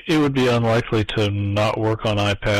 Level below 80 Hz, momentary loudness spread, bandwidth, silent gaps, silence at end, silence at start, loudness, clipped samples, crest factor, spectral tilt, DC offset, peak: -42 dBFS; 4 LU; 13.5 kHz; none; 0 s; 0.05 s; -20 LUFS; under 0.1%; 8 dB; -6 dB/octave; under 0.1%; -12 dBFS